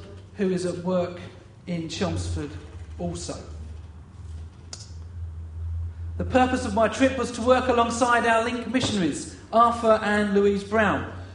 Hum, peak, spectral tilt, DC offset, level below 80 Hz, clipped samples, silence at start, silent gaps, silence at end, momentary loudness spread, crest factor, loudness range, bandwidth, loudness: none; -6 dBFS; -5 dB/octave; under 0.1%; -44 dBFS; under 0.1%; 0 s; none; 0 s; 20 LU; 20 dB; 14 LU; 10.5 kHz; -24 LUFS